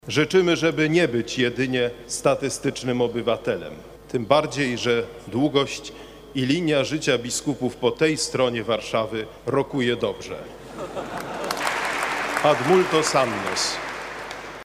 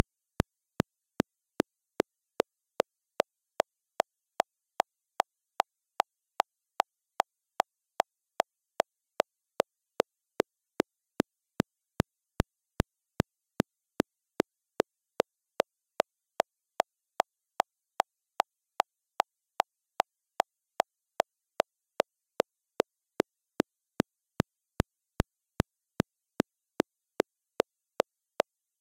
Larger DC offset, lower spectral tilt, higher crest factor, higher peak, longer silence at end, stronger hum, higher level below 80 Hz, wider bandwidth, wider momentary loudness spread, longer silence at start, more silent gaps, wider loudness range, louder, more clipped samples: neither; about the same, -4 dB/octave vs -5 dB/octave; second, 20 dB vs 28 dB; about the same, -4 dBFS vs -6 dBFS; second, 0 s vs 3.6 s; neither; about the same, -52 dBFS vs -54 dBFS; about the same, 15.5 kHz vs 16.5 kHz; first, 13 LU vs 1 LU; second, 0.05 s vs 25.2 s; neither; first, 4 LU vs 1 LU; first, -23 LUFS vs -35 LUFS; neither